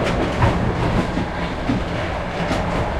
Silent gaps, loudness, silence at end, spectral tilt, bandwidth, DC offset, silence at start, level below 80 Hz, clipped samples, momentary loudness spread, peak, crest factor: none; -21 LUFS; 0 s; -6.5 dB/octave; 12.5 kHz; under 0.1%; 0 s; -30 dBFS; under 0.1%; 5 LU; -4 dBFS; 16 dB